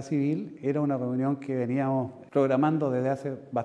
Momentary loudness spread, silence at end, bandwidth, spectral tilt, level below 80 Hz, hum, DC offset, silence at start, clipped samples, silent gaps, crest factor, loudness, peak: 7 LU; 0 s; 9.6 kHz; -9 dB/octave; -76 dBFS; none; under 0.1%; 0 s; under 0.1%; none; 16 dB; -28 LUFS; -12 dBFS